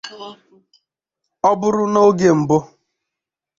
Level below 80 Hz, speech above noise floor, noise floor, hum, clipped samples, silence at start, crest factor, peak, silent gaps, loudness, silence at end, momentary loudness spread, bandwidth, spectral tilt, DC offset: -58 dBFS; 68 dB; -84 dBFS; none; under 0.1%; 0.05 s; 16 dB; -2 dBFS; none; -16 LUFS; 0.95 s; 21 LU; 7.6 kHz; -6.5 dB/octave; under 0.1%